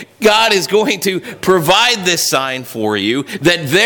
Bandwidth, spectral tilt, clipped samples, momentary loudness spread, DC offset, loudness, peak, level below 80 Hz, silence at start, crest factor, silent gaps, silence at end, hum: 19.5 kHz; -3 dB/octave; under 0.1%; 8 LU; under 0.1%; -13 LUFS; -2 dBFS; -52 dBFS; 0 s; 12 dB; none; 0 s; none